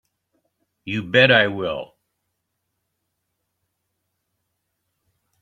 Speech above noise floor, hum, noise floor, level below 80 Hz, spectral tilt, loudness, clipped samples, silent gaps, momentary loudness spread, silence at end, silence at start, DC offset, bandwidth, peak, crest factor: 58 dB; none; -77 dBFS; -62 dBFS; -6 dB/octave; -18 LUFS; under 0.1%; none; 15 LU; 3.55 s; 0.85 s; under 0.1%; 7.6 kHz; -2 dBFS; 24 dB